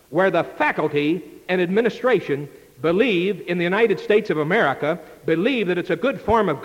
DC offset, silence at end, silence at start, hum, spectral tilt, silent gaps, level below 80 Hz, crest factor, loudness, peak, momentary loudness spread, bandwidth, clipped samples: under 0.1%; 0 s; 0.1 s; none; -7 dB/octave; none; -52 dBFS; 14 dB; -21 LUFS; -6 dBFS; 7 LU; 16.5 kHz; under 0.1%